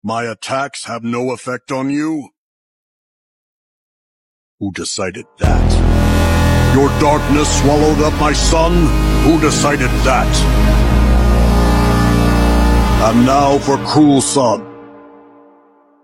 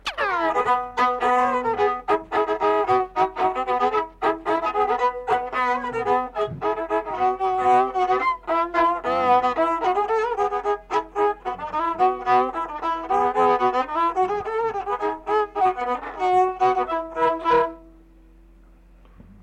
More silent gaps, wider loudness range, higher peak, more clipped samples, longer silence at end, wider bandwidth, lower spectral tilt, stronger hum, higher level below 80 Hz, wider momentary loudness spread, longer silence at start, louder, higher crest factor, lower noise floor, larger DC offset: first, 2.37-4.58 s vs none; first, 12 LU vs 2 LU; first, 0 dBFS vs -10 dBFS; neither; second, 1.05 s vs 1.55 s; first, 16 kHz vs 9.8 kHz; about the same, -5.5 dB/octave vs -5 dB/octave; neither; first, -18 dBFS vs -52 dBFS; first, 10 LU vs 6 LU; about the same, 0.05 s vs 0.05 s; first, -13 LUFS vs -22 LUFS; about the same, 14 dB vs 12 dB; about the same, -49 dBFS vs -50 dBFS; neither